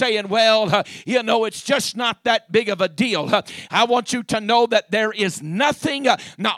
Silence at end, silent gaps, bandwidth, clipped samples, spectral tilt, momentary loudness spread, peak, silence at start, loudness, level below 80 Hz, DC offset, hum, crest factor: 0 s; none; 14.5 kHz; under 0.1%; -3.5 dB/octave; 6 LU; -2 dBFS; 0 s; -19 LUFS; -62 dBFS; under 0.1%; none; 18 dB